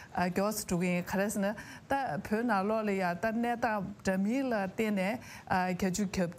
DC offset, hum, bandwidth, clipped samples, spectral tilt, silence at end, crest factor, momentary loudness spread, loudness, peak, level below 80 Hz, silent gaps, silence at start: under 0.1%; none; 16 kHz; under 0.1%; -5.5 dB/octave; 0 s; 16 dB; 4 LU; -32 LUFS; -16 dBFS; -60 dBFS; none; 0 s